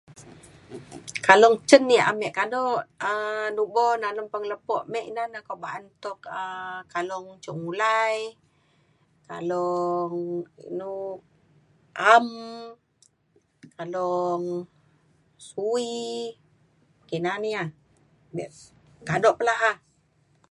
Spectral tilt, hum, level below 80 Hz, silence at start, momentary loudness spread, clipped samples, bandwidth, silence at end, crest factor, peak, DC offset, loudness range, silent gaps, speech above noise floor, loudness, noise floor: -4 dB/octave; none; -70 dBFS; 0.1 s; 20 LU; under 0.1%; 11.5 kHz; 0.75 s; 26 dB; 0 dBFS; under 0.1%; 11 LU; none; 42 dB; -24 LUFS; -66 dBFS